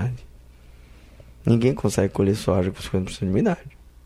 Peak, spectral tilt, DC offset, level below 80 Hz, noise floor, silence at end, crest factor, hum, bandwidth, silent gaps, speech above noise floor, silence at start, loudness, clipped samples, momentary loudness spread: -4 dBFS; -7 dB/octave; under 0.1%; -44 dBFS; -47 dBFS; 0.35 s; 20 dB; none; 14.5 kHz; none; 25 dB; 0 s; -23 LUFS; under 0.1%; 9 LU